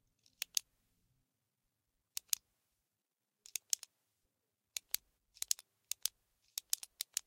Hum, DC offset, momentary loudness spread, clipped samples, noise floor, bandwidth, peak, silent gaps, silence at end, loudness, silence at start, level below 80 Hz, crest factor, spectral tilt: none; under 0.1%; 8 LU; under 0.1%; -89 dBFS; 17 kHz; -8 dBFS; none; 0.05 s; -41 LUFS; 0.55 s; -86 dBFS; 38 dB; 4.5 dB/octave